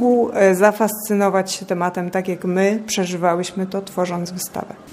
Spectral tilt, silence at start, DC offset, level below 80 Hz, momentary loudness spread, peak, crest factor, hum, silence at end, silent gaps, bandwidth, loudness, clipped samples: -5 dB/octave; 0 s; under 0.1%; -64 dBFS; 10 LU; -2 dBFS; 18 dB; none; 0 s; none; 15.5 kHz; -19 LUFS; under 0.1%